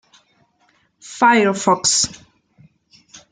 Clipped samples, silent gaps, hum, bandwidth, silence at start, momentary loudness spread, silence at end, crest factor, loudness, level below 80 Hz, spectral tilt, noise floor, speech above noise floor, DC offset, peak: under 0.1%; none; none; 10 kHz; 1.05 s; 8 LU; 0.15 s; 18 dB; -16 LUFS; -58 dBFS; -2 dB/octave; -61 dBFS; 45 dB; under 0.1%; -2 dBFS